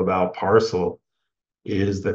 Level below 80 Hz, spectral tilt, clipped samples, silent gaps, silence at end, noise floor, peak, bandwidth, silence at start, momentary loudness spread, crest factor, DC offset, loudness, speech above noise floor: -56 dBFS; -6.5 dB/octave; under 0.1%; none; 0 s; -82 dBFS; -4 dBFS; 7.8 kHz; 0 s; 10 LU; 18 dB; under 0.1%; -22 LUFS; 61 dB